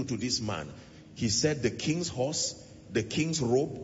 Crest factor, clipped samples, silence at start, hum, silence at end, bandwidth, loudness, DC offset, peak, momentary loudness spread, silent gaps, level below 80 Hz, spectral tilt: 18 dB; under 0.1%; 0 s; none; 0 s; 8 kHz; -30 LUFS; under 0.1%; -14 dBFS; 15 LU; none; -58 dBFS; -4 dB/octave